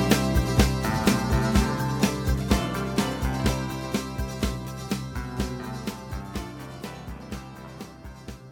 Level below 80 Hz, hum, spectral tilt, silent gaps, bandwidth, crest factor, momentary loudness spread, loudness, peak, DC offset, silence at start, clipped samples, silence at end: -34 dBFS; none; -5.5 dB/octave; none; 19 kHz; 22 dB; 16 LU; -26 LUFS; -4 dBFS; under 0.1%; 0 s; under 0.1%; 0 s